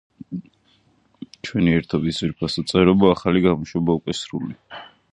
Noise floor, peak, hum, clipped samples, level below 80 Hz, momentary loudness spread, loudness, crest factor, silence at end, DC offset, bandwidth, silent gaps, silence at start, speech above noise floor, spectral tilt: -60 dBFS; -2 dBFS; none; under 0.1%; -46 dBFS; 18 LU; -20 LUFS; 20 dB; 0.25 s; under 0.1%; 11 kHz; none; 0.3 s; 41 dB; -6.5 dB/octave